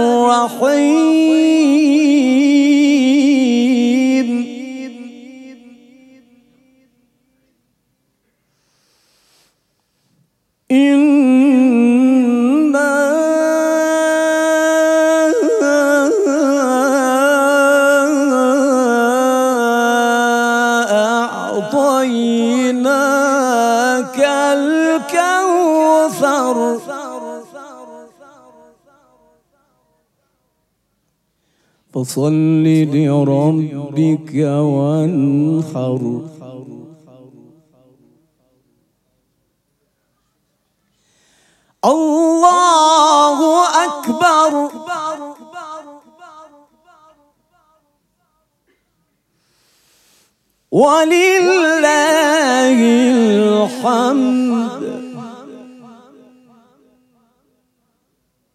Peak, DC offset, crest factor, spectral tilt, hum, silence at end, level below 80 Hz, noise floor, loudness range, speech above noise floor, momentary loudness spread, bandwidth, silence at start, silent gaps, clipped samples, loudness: 0 dBFS; under 0.1%; 14 dB; -5 dB/octave; none; 2.85 s; -72 dBFS; -66 dBFS; 11 LU; 53 dB; 14 LU; 14 kHz; 0 s; none; under 0.1%; -13 LUFS